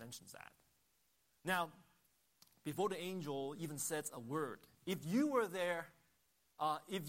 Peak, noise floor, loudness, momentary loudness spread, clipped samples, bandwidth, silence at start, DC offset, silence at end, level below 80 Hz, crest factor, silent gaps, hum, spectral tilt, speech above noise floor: -24 dBFS; -79 dBFS; -41 LUFS; 15 LU; under 0.1%; 16 kHz; 0 s; under 0.1%; 0 s; -82 dBFS; 20 dB; none; none; -4.5 dB/octave; 38 dB